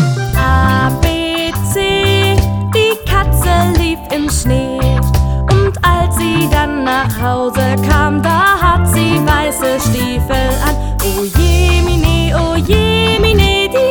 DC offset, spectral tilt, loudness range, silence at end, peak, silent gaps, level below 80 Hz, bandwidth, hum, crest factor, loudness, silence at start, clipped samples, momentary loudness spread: under 0.1%; -5 dB/octave; 1 LU; 0 s; 0 dBFS; none; -18 dBFS; over 20 kHz; none; 12 dB; -12 LUFS; 0 s; under 0.1%; 5 LU